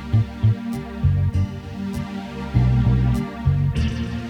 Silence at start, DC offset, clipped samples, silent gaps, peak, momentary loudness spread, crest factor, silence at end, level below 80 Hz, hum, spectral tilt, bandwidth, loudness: 0 s; under 0.1%; under 0.1%; none; -6 dBFS; 11 LU; 14 dB; 0 s; -30 dBFS; none; -8 dB/octave; 10.5 kHz; -22 LUFS